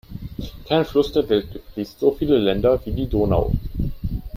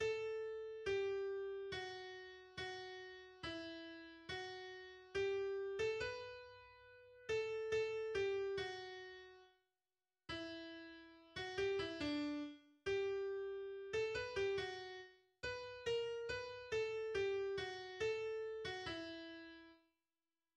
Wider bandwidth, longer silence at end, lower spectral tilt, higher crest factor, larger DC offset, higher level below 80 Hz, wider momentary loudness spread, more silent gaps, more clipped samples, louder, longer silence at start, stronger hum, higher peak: first, 15 kHz vs 9.8 kHz; second, 0 s vs 0.8 s; first, -8 dB/octave vs -4.5 dB/octave; about the same, 16 dB vs 16 dB; neither; first, -32 dBFS vs -70 dBFS; about the same, 15 LU vs 14 LU; neither; neither; first, -21 LUFS vs -45 LUFS; about the same, 0.1 s vs 0 s; neither; first, -4 dBFS vs -30 dBFS